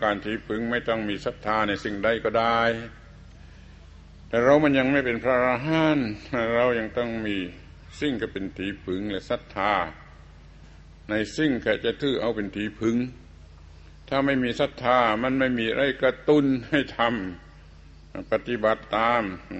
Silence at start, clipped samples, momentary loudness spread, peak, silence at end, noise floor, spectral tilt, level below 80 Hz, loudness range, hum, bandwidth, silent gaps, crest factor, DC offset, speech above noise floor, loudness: 0 s; under 0.1%; 10 LU; -6 dBFS; 0 s; -48 dBFS; -6 dB/octave; -48 dBFS; 6 LU; none; 8.4 kHz; none; 20 dB; under 0.1%; 23 dB; -25 LUFS